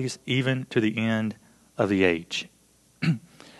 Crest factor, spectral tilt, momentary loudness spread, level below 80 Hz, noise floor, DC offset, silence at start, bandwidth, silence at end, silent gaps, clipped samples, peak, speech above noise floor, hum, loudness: 20 dB; -6 dB/octave; 12 LU; -58 dBFS; -52 dBFS; under 0.1%; 0 s; 12.5 kHz; 0.4 s; none; under 0.1%; -6 dBFS; 27 dB; none; -26 LUFS